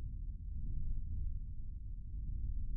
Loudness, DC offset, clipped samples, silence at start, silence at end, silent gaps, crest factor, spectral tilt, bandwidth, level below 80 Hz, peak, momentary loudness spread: -46 LUFS; under 0.1%; under 0.1%; 0 s; 0 s; none; 12 dB; -21 dB/octave; 0.4 kHz; -40 dBFS; -28 dBFS; 5 LU